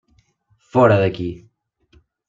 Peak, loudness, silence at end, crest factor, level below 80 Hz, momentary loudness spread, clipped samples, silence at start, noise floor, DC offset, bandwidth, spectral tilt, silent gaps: -2 dBFS; -18 LUFS; 0.9 s; 20 dB; -52 dBFS; 16 LU; under 0.1%; 0.75 s; -62 dBFS; under 0.1%; 7.6 kHz; -8.5 dB/octave; none